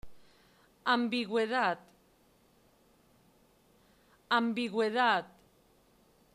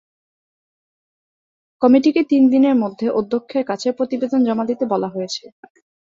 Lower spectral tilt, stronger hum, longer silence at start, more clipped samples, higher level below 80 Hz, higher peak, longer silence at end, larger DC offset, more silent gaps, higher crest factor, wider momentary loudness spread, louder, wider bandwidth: second, -4.5 dB/octave vs -6 dB/octave; neither; second, 0.05 s vs 1.8 s; neither; second, -70 dBFS vs -64 dBFS; second, -16 dBFS vs -2 dBFS; first, 1.05 s vs 0.75 s; neither; neither; about the same, 20 dB vs 18 dB; second, 7 LU vs 10 LU; second, -31 LUFS vs -18 LUFS; first, 13 kHz vs 7.6 kHz